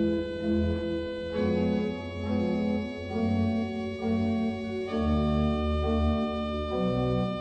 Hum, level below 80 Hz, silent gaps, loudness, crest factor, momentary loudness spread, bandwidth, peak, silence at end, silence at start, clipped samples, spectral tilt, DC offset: none; -38 dBFS; none; -29 LUFS; 12 dB; 5 LU; 8.4 kHz; -16 dBFS; 0 s; 0 s; under 0.1%; -8.5 dB/octave; under 0.1%